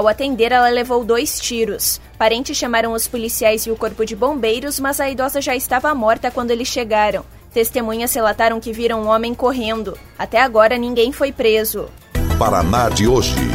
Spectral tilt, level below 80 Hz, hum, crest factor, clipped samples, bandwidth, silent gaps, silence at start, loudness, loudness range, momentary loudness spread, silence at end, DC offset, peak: -4 dB/octave; -32 dBFS; none; 16 dB; under 0.1%; 16.5 kHz; none; 0 s; -17 LUFS; 2 LU; 7 LU; 0 s; under 0.1%; 0 dBFS